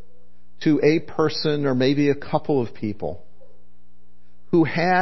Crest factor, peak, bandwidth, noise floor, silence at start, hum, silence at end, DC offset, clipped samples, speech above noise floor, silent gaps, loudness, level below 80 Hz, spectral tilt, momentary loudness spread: 18 dB; -4 dBFS; 6 kHz; -60 dBFS; 0.6 s; none; 0 s; 3%; under 0.1%; 39 dB; none; -22 LUFS; -56 dBFS; -7 dB/octave; 10 LU